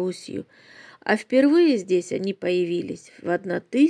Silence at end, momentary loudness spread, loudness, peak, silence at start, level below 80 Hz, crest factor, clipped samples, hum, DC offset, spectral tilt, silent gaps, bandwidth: 0 s; 16 LU; -23 LUFS; -6 dBFS; 0 s; -74 dBFS; 16 dB; under 0.1%; none; under 0.1%; -6 dB/octave; none; 10.5 kHz